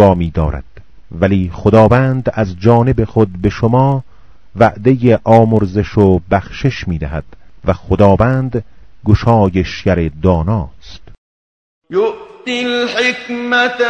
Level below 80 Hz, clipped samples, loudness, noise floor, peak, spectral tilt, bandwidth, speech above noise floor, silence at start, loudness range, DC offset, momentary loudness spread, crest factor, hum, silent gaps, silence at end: -30 dBFS; 0.6%; -13 LUFS; under -90 dBFS; 0 dBFS; -7.5 dB/octave; 8.2 kHz; over 78 dB; 0 s; 5 LU; 2%; 11 LU; 14 dB; none; 11.18-11.82 s; 0 s